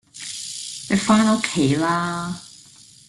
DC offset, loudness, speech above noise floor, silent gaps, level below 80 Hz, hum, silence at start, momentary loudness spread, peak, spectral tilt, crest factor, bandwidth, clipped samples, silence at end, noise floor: under 0.1%; -21 LUFS; 28 dB; none; -56 dBFS; none; 0.15 s; 14 LU; -4 dBFS; -4.5 dB/octave; 18 dB; 12.5 kHz; under 0.1%; 0.5 s; -48 dBFS